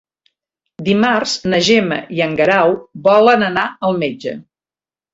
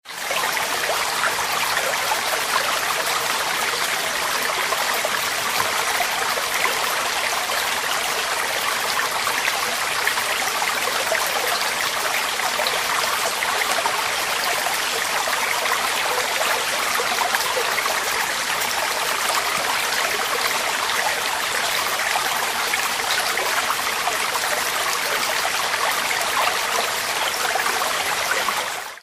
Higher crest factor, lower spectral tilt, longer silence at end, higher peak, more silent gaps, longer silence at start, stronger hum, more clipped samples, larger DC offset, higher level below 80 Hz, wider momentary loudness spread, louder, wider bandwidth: second, 14 dB vs 20 dB; first, -4.5 dB/octave vs 0.5 dB/octave; first, 0.7 s vs 0.05 s; about the same, 0 dBFS vs -2 dBFS; neither; first, 0.8 s vs 0.05 s; neither; neither; neither; about the same, -54 dBFS vs -58 dBFS; first, 11 LU vs 1 LU; first, -14 LUFS vs -20 LUFS; second, 8 kHz vs 16 kHz